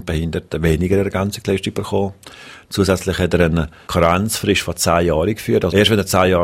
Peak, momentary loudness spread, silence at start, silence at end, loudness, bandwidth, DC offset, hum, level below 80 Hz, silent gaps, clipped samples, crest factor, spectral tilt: 0 dBFS; 8 LU; 0 s; 0 s; -17 LUFS; 16 kHz; under 0.1%; none; -34 dBFS; none; under 0.1%; 18 dB; -5 dB/octave